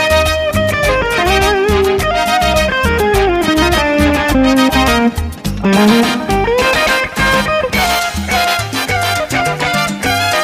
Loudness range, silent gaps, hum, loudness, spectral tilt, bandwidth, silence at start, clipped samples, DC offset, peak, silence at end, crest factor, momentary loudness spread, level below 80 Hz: 2 LU; none; none; -12 LUFS; -4.5 dB/octave; 16 kHz; 0 s; under 0.1%; under 0.1%; 0 dBFS; 0 s; 12 dB; 4 LU; -24 dBFS